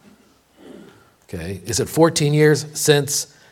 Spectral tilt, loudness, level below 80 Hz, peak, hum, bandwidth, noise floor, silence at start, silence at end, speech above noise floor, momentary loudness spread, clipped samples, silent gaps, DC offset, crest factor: -4.5 dB/octave; -18 LUFS; -52 dBFS; 0 dBFS; none; 17 kHz; -54 dBFS; 0.65 s; 0.3 s; 36 dB; 15 LU; under 0.1%; none; under 0.1%; 20 dB